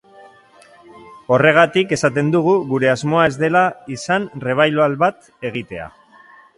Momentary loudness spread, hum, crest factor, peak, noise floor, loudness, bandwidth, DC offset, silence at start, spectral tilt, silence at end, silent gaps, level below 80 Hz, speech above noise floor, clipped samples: 15 LU; none; 18 dB; 0 dBFS; -47 dBFS; -16 LUFS; 11.5 kHz; under 0.1%; 0.95 s; -5.5 dB/octave; 0.7 s; none; -56 dBFS; 31 dB; under 0.1%